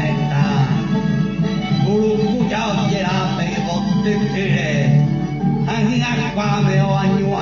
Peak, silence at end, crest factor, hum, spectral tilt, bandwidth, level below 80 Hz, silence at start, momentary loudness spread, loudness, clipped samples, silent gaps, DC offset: -4 dBFS; 0 s; 12 dB; none; -7 dB/octave; 7.2 kHz; -40 dBFS; 0 s; 3 LU; -18 LUFS; under 0.1%; none; under 0.1%